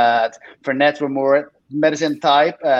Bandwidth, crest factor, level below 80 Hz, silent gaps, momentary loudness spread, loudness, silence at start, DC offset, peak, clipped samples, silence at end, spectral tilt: 7.8 kHz; 16 dB; -70 dBFS; none; 9 LU; -18 LUFS; 0 s; under 0.1%; -2 dBFS; under 0.1%; 0 s; -4.5 dB/octave